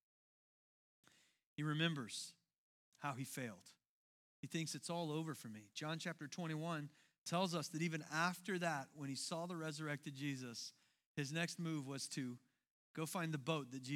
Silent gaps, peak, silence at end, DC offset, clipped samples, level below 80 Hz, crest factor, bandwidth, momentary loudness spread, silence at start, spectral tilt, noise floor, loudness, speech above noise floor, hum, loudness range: 2.58-2.92 s, 3.87-4.43 s, 7.18-7.26 s, 11.06-11.15 s, 12.70-12.94 s; -24 dBFS; 0 s; under 0.1%; under 0.1%; under -90 dBFS; 22 dB; 16.5 kHz; 11 LU; 1.6 s; -4.5 dB/octave; under -90 dBFS; -45 LUFS; over 46 dB; none; 4 LU